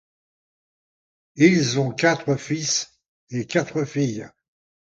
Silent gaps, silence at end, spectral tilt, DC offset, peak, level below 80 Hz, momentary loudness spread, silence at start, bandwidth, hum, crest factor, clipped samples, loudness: 3.08-3.27 s; 0.7 s; -4.5 dB/octave; under 0.1%; -2 dBFS; -64 dBFS; 14 LU; 1.35 s; 9.2 kHz; none; 22 dB; under 0.1%; -22 LUFS